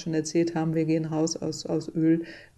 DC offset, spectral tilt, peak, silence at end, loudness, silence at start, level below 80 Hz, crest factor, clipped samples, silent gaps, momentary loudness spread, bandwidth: under 0.1%; -6 dB/octave; -14 dBFS; 0.15 s; -27 LUFS; 0 s; -62 dBFS; 12 dB; under 0.1%; none; 5 LU; 9.8 kHz